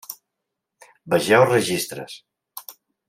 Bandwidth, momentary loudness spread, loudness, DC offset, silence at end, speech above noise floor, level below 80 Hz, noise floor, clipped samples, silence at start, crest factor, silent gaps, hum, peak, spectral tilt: 16 kHz; 24 LU; -19 LUFS; under 0.1%; 0.4 s; 62 dB; -68 dBFS; -82 dBFS; under 0.1%; 0.1 s; 22 dB; none; none; -2 dBFS; -4 dB/octave